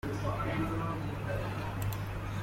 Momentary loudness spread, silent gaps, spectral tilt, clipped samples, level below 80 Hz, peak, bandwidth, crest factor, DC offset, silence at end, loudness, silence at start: 3 LU; none; -6.5 dB/octave; under 0.1%; -46 dBFS; -20 dBFS; 16.5 kHz; 14 dB; under 0.1%; 0 s; -36 LUFS; 0.05 s